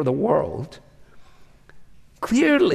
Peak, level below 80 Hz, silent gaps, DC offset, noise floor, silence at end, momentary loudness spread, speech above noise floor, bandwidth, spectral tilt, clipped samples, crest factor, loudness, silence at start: -6 dBFS; -52 dBFS; none; under 0.1%; -49 dBFS; 0 s; 16 LU; 29 dB; 13.5 kHz; -6 dB/octave; under 0.1%; 16 dB; -21 LUFS; 0 s